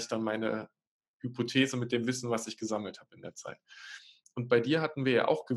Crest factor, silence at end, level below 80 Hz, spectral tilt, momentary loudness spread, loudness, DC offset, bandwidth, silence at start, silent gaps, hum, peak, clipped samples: 20 dB; 0 s; -82 dBFS; -5 dB/octave; 19 LU; -31 LUFS; under 0.1%; 12.5 kHz; 0 s; 0.87-1.00 s, 1.08-1.20 s; none; -12 dBFS; under 0.1%